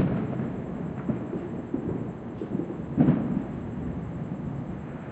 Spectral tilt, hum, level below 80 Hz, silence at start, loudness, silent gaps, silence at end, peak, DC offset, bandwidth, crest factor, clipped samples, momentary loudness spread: -10.5 dB/octave; none; -50 dBFS; 0 s; -31 LUFS; none; 0 s; -8 dBFS; under 0.1%; 8 kHz; 22 dB; under 0.1%; 11 LU